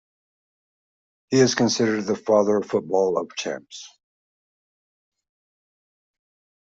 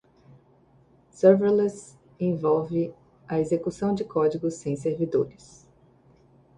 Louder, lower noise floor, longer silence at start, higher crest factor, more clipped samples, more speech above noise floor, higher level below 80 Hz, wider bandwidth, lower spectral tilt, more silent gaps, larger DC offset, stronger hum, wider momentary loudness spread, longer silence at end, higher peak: first, -22 LUFS vs -25 LUFS; first, under -90 dBFS vs -59 dBFS; first, 1.3 s vs 1.15 s; about the same, 20 dB vs 20 dB; neither; first, over 69 dB vs 35 dB; second, -68 dBFS vs -62 dBFS; second, 7.8 kHz vs 10.5 kHz; second, -4.5 dB/octave vs -8 dB/octave; neither; neither; neither; about the same, 13 LU vs 11 LU; first, 2.75 s vs 1.3 s; about the same, -4 dBFS vs -6 dBFS